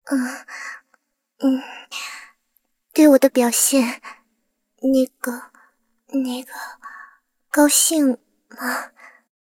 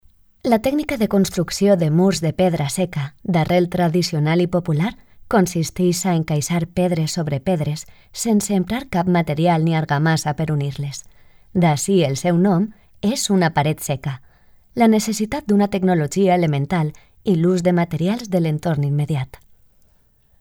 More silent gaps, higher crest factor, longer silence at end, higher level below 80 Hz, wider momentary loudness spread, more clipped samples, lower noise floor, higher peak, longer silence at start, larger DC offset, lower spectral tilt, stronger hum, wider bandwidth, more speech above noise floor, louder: neither; about the same, 20 dB vs 16 dB; second, 0.7 s vs 1.15 s; second, -70 dBFS vs -48 dBFS; first, 21 LU vs 9 LU; neither; first, -71 dBFS vs -57 dBFS; about the same, -2 dBFS vs -4 dBFS; second, 0.05 s vs 0.45 s; neither; second, -1.5 dB/octave vs -6 dB/octave; neither; about the same, 17 kHz vs 17.5 kHz; first, 53 dB vs 38 dB; about the same, -19 LUFS vs -19 LUFS